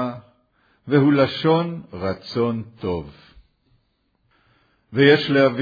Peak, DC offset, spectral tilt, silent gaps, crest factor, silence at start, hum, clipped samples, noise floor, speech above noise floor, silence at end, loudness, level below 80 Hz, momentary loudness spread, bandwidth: -2 dBFS; under 0.1%; -8 dB/octave; none; 18 dB; 0 s; none; under 0.1%; -67 dBFS; 48 dB; 0 s; -20 LUFS; -56 dBFS; 14 LU; 5 kHz